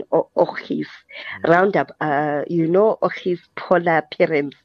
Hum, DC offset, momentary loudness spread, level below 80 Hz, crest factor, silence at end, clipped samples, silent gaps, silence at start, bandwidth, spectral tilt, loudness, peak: none; under 0.1%; 11 LU; -66 dBFS; 18 dB; 0.15 s; under 0.1%; none; 0 s; 6.8 kHz; -8 dB/octave; -19 LUFS; -2 dBFS